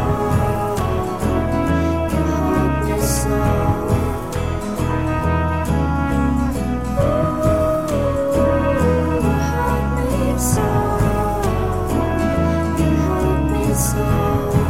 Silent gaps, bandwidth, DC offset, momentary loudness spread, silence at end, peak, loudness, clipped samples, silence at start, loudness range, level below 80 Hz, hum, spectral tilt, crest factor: none; 16.5 kHz; 1%; 3 LU; 0 s; -4 dBFS; -19 LUFS; under 0.1%; 0 s; 2 LU; -26 dBFS; none; -6.5 dB/octave; 12 dB